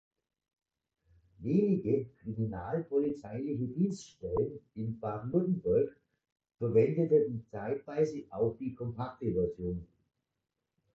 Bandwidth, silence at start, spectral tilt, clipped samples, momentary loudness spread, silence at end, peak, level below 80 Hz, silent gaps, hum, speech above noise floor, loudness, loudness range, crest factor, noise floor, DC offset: 7.8 kHz; 1.4 s; -9 dB/octave; under 0.1%; 11 LU; 1.15 s; -14 dBFS; -58 dBFS; 6.32-6.36 s; none; 55 dB; -33 LUFS; 4 LU; 18 dB; -87 dBFS; under 0.1%